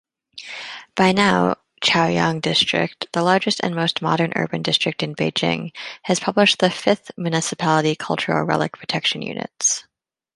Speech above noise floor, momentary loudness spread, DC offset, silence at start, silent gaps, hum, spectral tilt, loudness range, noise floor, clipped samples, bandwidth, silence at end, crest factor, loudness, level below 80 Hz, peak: 19 dB; 10 LU; under 0.1%; 0.35 s; none; none; -3.5 dB/octave; 2 LU; -39 dBFS; under 0.1%; 11.5 kHz; 0.55 s; 18 dB; -20 LUFS; -58 dBFS; -2 dBFS